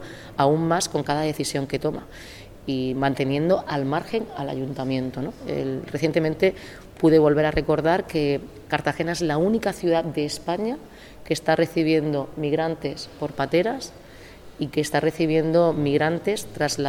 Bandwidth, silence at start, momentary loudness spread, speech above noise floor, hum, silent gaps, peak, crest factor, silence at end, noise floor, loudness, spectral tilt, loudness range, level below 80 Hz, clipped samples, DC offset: 17.5 kHz; 0 s; 11 LU; 21 dB; none; none; -6 dBFS; 18 dB; 0 s; -44 dBFS; -24 LUFS; -5.5 dB/octave; 4 LU; -48 dBFS; under 0.1%; 0.1%